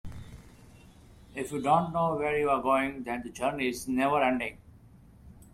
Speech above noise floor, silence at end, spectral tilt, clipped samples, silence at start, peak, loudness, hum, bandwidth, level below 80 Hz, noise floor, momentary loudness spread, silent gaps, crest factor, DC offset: 26 dB; 0.1 s; -5.5 dB/octave; under 0.1%; 0.05 s; -12 dBFS; -29 LUFS; none; 15.5 kHz; -54 dBFS; -54 dBFS; 15 LU; none; 20 dB; under 0.1%